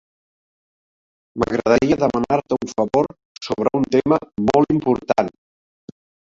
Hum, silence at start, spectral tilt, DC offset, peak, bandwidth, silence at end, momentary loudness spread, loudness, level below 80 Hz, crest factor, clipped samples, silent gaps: none; 1.35 s; -6.5 dB/octave; under 0.1%; 0 dBFS; 7.8 kHz; 1 s; 10 LU; -19 LUFS; -48 dBFS; 20 dB; under 0.1%; 3.25-3.35 s